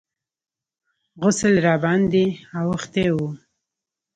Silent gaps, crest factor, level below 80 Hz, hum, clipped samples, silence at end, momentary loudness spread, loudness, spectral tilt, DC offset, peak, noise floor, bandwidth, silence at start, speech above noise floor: none; 18 dB; -52 dBFS; none; under 0.1%; 0.8 s; 9 LU; -20 LUFS; -6 dB/octave; under 0.1%; -4 dBFS; -90 dBFS; 9.4 kHz; 1.15 s; 70 dB